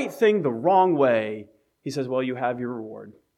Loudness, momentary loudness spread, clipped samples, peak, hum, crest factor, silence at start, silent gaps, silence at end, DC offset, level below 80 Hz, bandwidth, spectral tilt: -23 LUFS; 19 LU; under 0.1%; -8 dBFS; none; 16 dB; 0 s; none; 0.25 s; under 0.1%; -76 dBFS; 14.5 kHz; -6.5 dB/octave